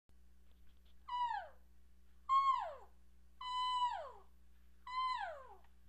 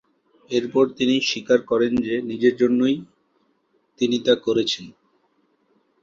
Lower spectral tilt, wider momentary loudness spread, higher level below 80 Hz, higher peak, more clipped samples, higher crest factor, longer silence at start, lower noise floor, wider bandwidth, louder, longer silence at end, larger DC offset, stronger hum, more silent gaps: second, -1.5 dB/octave vs -4.5 dB/octave; first, 24 LU vs 7 LU; second, -68 dBFS vs -60 dBFS; second, -26 dBFS vs -4 dBFS; neither; about the same, 18 dB vs 20 dB; about the same, 0.6 s vs 0.5 s; about the same, -67 dBFS vs -66 dBFS; first, 8.6 kHz vs 7.6 kHz; second, -39 LUFS vs -21 LUFS; second, 0.3 s vs 1.1 s; neither; neither; neither